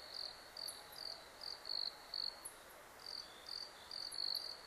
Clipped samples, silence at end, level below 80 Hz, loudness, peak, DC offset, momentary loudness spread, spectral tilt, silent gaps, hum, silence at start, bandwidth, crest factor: under 0.1%; 0 s; -76 dBFS; -45 LUFS; -30 dBFS; under 0.1%; 11 LU; 0 dB/octave; none; none; 0 s; 15.5 kHz; 18 dB